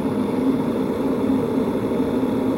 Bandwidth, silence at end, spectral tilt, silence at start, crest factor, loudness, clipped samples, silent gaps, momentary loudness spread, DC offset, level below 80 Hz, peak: 16 kHz; 0 s; -8 dB/octave; 0 s; 12 dB; -22 LUFS; under 0.1%; none; 2 LU; under 0.1%; -46 dBFS; -8 dBFS